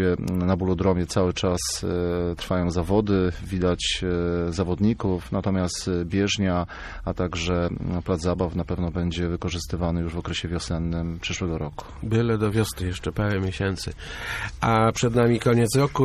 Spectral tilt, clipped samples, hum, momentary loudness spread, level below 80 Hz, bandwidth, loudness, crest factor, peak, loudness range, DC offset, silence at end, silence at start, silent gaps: -5.5 dB/octave; under 0.1%; none; 8 LU; -38 dBFS; 14.5 kHz; -25 LUFS; 16 dB; -8 dBFS; 3 LU; under 0.1%; 0 s; 0 s; none